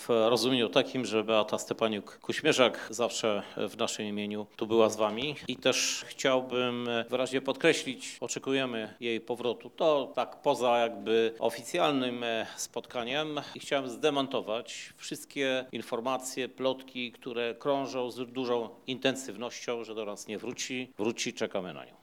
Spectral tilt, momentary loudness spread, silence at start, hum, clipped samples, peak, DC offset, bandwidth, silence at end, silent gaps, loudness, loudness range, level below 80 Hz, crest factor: -3.5 dB/octave; 11 LU; 0 s; none; under 0.1%; -8 dBFS; under 0.1%; 17 kHz; 0.15 s; none; -31 LUFS; 5 LU; -76 dBFS; 24 dB